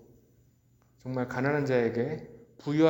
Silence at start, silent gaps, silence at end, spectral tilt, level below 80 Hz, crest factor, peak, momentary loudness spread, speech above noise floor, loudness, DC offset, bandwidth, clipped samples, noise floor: 1.05 s; none; 0 s; -7.5 dB/octave; -66 dBFS; 20 dB; -10 dBFS; 15 LU; 37 dB; -30 LUFS; under 0.1%; 17 kHz; under 0.1%; -65 dBFS